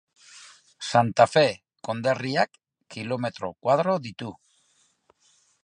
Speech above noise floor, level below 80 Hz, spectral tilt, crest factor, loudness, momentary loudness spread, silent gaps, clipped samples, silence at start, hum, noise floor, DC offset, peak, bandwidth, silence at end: 42 dB; -68 dBFS; -5 dB/octave; 24 dB; -24 LUFS; 18 LU; none; under 0.1%; 0.35 s; none; -66 dBFS; under 0.1%; -4 dBFS; 11 kHz; 1.3 s